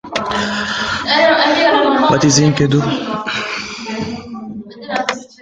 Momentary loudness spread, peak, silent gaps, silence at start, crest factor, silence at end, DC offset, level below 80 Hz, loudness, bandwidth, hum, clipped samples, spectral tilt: 14 LU; 0 dBFS; none; 0.05 s; 16 dB; 0.15 s; under 0.1%; -46 dBFS; -15 LUFS; 9.4 kHz; none; under 0.1%; -4 dB/octave